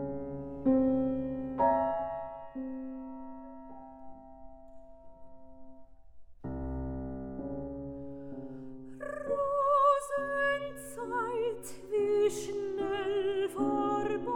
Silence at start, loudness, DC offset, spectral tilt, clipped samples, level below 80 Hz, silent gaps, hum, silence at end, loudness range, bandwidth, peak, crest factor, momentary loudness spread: 0 s; -32 LUFS; under 0.1%; -6 dB/octave; under 0.1%; -54 dBFS; none; none; 0 s; 16 LU; 16 kHz; -16 dBFS; 18 dB; 19 LU